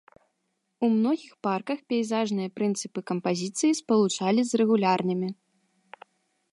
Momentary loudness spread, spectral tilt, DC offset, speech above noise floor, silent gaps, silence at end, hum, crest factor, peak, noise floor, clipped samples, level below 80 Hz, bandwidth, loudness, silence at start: 8 LU; -5 dB/octave; under 0.1%; 52 dB; none; 1.2 s; none; 16 dB; -10 dBFS; -77 dBFS; under 0.1%; -78 dBFS; 11.5 kHz; -26 LUFS; 0.8 s